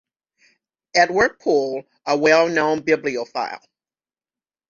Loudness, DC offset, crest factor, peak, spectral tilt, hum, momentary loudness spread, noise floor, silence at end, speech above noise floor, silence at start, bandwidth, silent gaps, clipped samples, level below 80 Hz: -19 LUFS; under 0.1%; 20 dB; -2 dBFS; -4 dB/octave; none; 12 LU; under -90 dBFS; 1.15 s; over 71 dB; 0.95 s; 7.6 kHz; none; under 0.1%; -58 dBFS